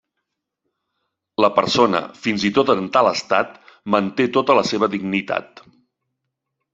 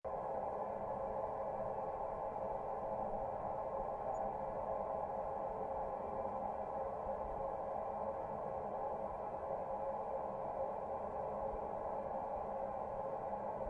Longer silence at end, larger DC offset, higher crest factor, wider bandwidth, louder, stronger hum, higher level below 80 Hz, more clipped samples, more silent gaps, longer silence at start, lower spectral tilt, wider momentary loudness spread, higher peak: first, 1.3 s vs 0 s; neither; first, 20 dB vs 12 dB; second, 8 kHz vs 9.4 kHz; first, -19 LUFS vs -42 LUFS; neither; about the same, -60 dBFS vs -60 dBFS; neither; neither; first, 1.4 s vs 0.05 s; second, -5 dB/octave vs -8.5 dB/octave; first, 9 LU vs 1 LU; first, -2 dBFS vs -28 dBFS